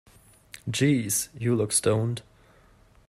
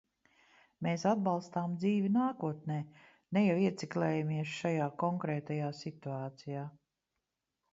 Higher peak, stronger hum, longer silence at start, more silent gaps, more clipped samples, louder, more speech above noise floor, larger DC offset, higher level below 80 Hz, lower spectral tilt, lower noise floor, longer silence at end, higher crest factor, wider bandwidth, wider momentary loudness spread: first, -8 dBFS vs -18 dBFS; neither; second, 0.65 s vs 0.8 s; neither; neither; first, -25 LUFS vs -34 LUFS; second, 32 dB vs 54 dB; neither; first, -60 dBFS vs -76 dBFS; second, -4.5 dB/octave vs -7.5 dB/octave; second, -57 dBFS vs -87 dBFS; about the same, 0.9 s vs 1 s; about the same, 18 dB vs 18 dB; first, 16 kHz vs 7.8 kHz; about the same, 10 LU vs 11 LU